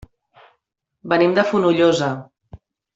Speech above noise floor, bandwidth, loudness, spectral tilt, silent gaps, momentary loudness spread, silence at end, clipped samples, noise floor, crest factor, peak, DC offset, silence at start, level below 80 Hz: 56 dB; 8 kHz; -17 LUFS; -6 dB/octave; none; 14 LU; 0.4 s; under 0.1%; -73 dBFS; 18 dB; -4 dBFS; under 0.1%; 1.05 s; -56 dBFS